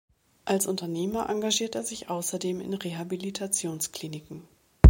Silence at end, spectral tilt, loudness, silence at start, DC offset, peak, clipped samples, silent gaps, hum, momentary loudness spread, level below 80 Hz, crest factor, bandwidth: 0 s; -5 dB/octave; -30 LUFS; 0.45 s; under 0.1%; 0 dBFS; under 0.1%; none; none; 12 LU; -40 dBFS; 26 dB; 17 kHz